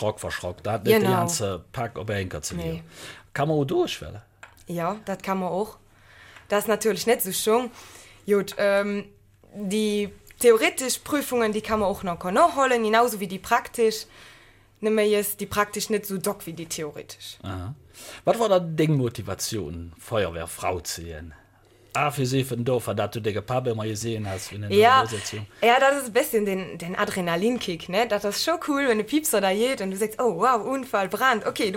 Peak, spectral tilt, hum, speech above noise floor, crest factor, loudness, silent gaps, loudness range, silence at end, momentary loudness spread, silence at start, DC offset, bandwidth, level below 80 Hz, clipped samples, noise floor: -4 dBFS; -4.5 dB/octave; none; 32 dB; 20 dB; -24 LUFS; none; 7 LU; 0 s; 14 LU; 0 s; under 0.1%; 17 kHz; -54 dBFS; under 0.1%; -56 dBFS